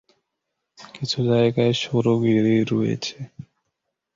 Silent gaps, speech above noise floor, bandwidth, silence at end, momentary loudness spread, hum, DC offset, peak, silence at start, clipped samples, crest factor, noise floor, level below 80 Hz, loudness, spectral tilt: none; 60 dB; 7.6 kHz; 0.75 s; 13 LU; none; under 0.1%; -6 dBFS; 0.8 s; under 0.1%; 16 dB; -80 dBFS; -60 dBFS; -21 LUFS; -6.5 dB/octave